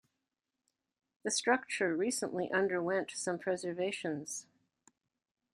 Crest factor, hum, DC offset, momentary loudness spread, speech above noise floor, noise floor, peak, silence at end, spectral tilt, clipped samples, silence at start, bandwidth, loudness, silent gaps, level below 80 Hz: 20 dB; none; under 0.1%; 8 LU; 54 dB; -89 dBFS; -16 dBFS; 1.1 s; -3 dB/octave; under 0.1%; 1.25 s; 15 kHz; -35 LUFS; none; -80 dBFS